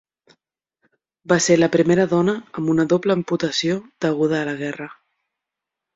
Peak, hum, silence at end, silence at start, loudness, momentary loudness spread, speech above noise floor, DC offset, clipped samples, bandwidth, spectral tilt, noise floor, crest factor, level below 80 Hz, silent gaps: -2 dBFS; none; 1.05 s; 1.3 s; -19 LUFS; 10 LU; 66 dB; under 0.1%; under 0.1%; 8 kHz; -5 dB/octave; -85 dBFS; 18 dB; -60 dBFS; none